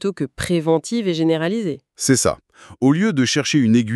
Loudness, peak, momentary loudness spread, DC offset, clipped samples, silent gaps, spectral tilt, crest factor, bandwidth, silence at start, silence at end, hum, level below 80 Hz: -19 LUFS; -4 dBFS; 8 LU; under 0.1%; under 0.1%; none; -5 dB/octave; 16 dB; 13.5 kHz; 0 s; 0 s; none; -50 dBFS